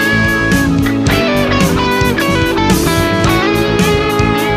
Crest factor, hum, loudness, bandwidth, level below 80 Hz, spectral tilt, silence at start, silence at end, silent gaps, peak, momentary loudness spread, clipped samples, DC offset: 12 dB; none; -12 LUFS; 15.5 kHz; -26 dBFS; -5 dB/octave; 0 s; 0 s; none; 0 dBFS; 1 LU; under 0.1%; under 0.1%